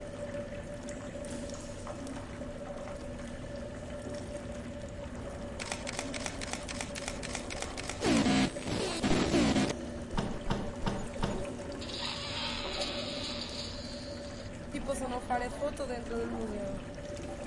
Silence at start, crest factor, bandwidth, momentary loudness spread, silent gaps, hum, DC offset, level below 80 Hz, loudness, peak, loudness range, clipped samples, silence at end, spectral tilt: 0 s; 20 dB; 11.5 kHz; 12 LU; none; none; under 0.1%; -46 dBFS; -36 LUFS; -14 dBFS; 11 LU; under 0.1%; 0 s; -4.5 dB/octave